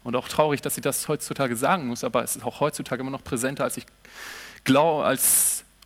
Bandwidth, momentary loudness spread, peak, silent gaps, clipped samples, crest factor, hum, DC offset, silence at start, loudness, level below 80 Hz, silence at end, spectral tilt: 17 kHz; 12 LU; -6 dBFS; none; under 0.1%; 20 dB; none; under 0.1%; 0.05 s; -24 LUFS; -58 dBFS; 0.25 s; -3.5 dB/octave